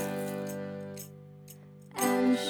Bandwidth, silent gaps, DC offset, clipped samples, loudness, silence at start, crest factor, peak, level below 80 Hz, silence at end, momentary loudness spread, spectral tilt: over 20 kHz; none; under 0.1%; under 0.1%; -33 LUFS; 0 s; 18 dB; -14 dBFS; -76 dBFS; 0 s; 23 LU; -4.5 dB/octave